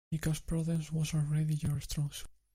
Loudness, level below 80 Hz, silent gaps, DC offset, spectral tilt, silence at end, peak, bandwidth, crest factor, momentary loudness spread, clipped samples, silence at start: -34 LUFS; -48 dBFS; none; under 0.1%; -6 dB/octave; 0.25 s; -20 dBFS; 16 kHz; 14 dB; 5 LU; under 0.1%; 0.1 s